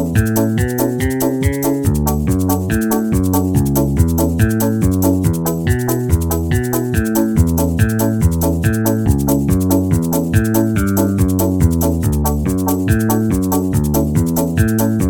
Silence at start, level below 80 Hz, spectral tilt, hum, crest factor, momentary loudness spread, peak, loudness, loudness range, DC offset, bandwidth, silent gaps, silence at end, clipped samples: 0 s; -26 dBFS; -6.5 dB/octave; none; 14 dB; 2 LU; 0 dBFS; -16 LUFS; 1 LU; under 0.1%; 19 kHz; none; 0 s; under 0.1%